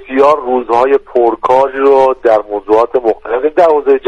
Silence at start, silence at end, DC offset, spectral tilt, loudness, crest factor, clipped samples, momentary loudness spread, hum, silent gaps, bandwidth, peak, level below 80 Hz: 0 s; 0 s; under 0.1%; -6 dB/octave; -11 LUFS; 10 dB; under 0.1%; 5 LU; none; none; 8 kHz; 0 dBFS; -44 dBFS